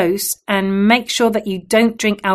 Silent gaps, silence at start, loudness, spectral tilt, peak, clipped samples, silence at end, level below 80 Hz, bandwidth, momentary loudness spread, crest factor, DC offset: none; 0 s; -16 LUFS; -4 dB/octave; 0 dBFS; under 0.1%; 0 s; -52 dBFS; 13.5 kHz; 5 LU; 16 dB; under 0.1%